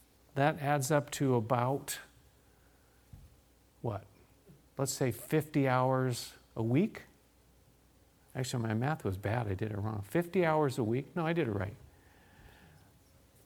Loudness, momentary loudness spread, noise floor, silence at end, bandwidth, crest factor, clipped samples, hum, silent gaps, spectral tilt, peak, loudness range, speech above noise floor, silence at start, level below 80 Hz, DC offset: -33 LUFS; 12 LU; -65 dBFS; 1 s; 19.5 kHz; 22 dB; under 0.1%; none; none; -6 dB/octave; -12 dBFS; 6 LU; 33 dB; 0.35 s; -64 dBFS; under 0.1%